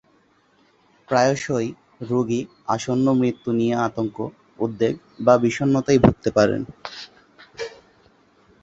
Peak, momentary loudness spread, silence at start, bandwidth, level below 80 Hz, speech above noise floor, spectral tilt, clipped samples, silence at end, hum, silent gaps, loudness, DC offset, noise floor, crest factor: -2 dBFS; 17 LU; 1.1 s; 8 kHz; -48 dBFS; 40 dB; -6.5 dB/octave; under 0.1%; 0.95 s; none; none; -21 LUFS; under 0.1%; -60 dBFS; 20 dB